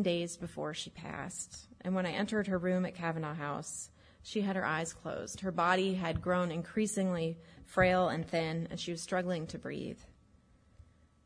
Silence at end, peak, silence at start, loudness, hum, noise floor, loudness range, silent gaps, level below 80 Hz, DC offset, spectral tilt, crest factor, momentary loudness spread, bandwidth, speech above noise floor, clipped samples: 0.4 s; -14 dBFS; 0 s; -35 LUFS; none; -65 dBFS; 4 LU; none; -60 dBFS; under 0.1%; -5 dB/octave; 20 dB; 12 LU; 11 kHz; 30 dB; under 0.1%